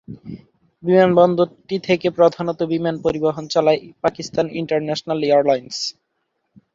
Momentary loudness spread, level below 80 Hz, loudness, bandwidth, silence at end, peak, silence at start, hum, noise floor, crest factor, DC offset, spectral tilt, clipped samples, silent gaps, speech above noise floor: 11 LU; -56 dBFS; -19 LUFS; 7.8 kHz; 0.85 s; -2 dBFS; 0.1 s; none; -72 dBFS; 18 dB; under 0.1%; -6 dB/octave; under 0.1%; none; 54 dB